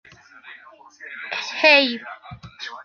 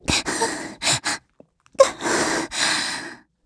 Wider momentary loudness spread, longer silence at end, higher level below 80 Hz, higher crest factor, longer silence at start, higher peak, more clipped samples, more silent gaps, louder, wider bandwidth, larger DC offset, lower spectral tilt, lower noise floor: first, 26 LU vs 12 LU; second, 0 s vs 0.3 s; second, -62 dBFS vs -46 dBFS; about the same, 22 dB vs 24 dB; first, 0.45 s vs 0.05 s; about the same, -2 dBFS vs 0 dBFS; neither; neither; first, -17 LUFS vs -21 LUFS; second, 7 kHz vs 11 kHz; neither; about the same, -3 dB/octave vs -2 dB/octave; second, -47 dBFS vs -55 dBFS